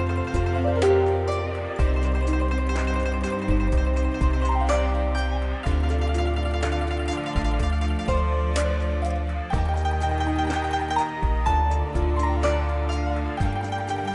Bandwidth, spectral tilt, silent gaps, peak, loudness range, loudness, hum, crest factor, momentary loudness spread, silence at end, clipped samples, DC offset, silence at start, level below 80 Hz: 11 kHz; -6.5 dB/octave; none; -10 dBFS; 1 LU; -24 LUFS; none; 12 dB; 4 LU; 0 s; under 0.1%; under 0.1%; 0 s; -26 dBFS